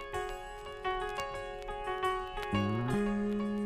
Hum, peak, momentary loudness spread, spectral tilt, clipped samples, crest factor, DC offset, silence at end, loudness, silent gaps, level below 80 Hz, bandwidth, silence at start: none; -18 dBFS; 9 LU; -6 dB/octave; under 0.1%; 16 dB; under 0.1%; 0 s; -35 LUFS; none; -50 dBFS; 15.5 kHz; 0 s